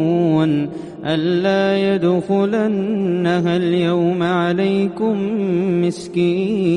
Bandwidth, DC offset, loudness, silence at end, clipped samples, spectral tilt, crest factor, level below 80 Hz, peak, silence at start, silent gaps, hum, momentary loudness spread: 10.5 kHz; under 0.1%; -18 LUFS; 0 s; under 0.1%; -7.5 dB/octave; 12 dB; -58 dBFS; -4 dBFS; 0 s; none; none; 4 LU